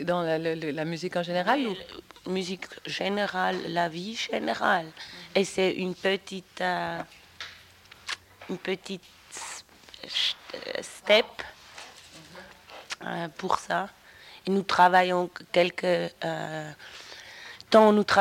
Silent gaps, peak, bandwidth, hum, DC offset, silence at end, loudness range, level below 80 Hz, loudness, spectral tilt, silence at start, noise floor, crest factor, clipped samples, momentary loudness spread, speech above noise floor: none; -6 dBFS; 16.5 kHz; none; under 0.1%; 0 s; 8 LU; -66 dBFS; -27 LUFS; -4.5 dB/octave; 0 s; -53 dBFS; 22 dB; under 0.1%; 20 LU; 26 dB